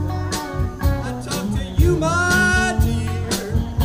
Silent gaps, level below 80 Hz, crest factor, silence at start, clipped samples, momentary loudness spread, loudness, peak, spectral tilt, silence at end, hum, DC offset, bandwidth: none; -26 dBFS; 16 dB; 0 s; under 0.1%; 9 LU; -20 LUFS; -4 dBFS; -5 dB/octave; 0 s; none; under 0.1%; 16 kHz